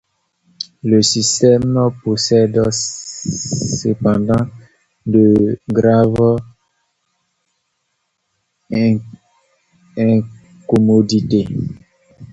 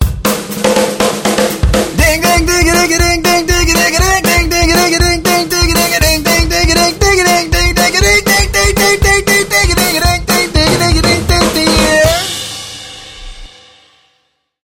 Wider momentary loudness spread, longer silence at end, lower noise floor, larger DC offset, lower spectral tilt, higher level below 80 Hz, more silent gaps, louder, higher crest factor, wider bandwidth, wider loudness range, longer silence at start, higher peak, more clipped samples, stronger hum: first, 12 LU vs 5 LU; second, 0.05 s vs 1.15 s; first, -70 dBFS vs -61 dBFS; neither; first, -5.5 dB/octave vs -3 dB/octave; second, -46 dBFS vs -20 dBFS; neither; second, -15 LUFS vs -10 LUFS; first, 16 dB vs 10 dB; second, 8.2 kHz vs 18.5 kHz; first, 6 LU vs 3 LU; first, 0.6 s vs 0 s; about the same, 0 dBFS vs 0 dBFS; neither; neither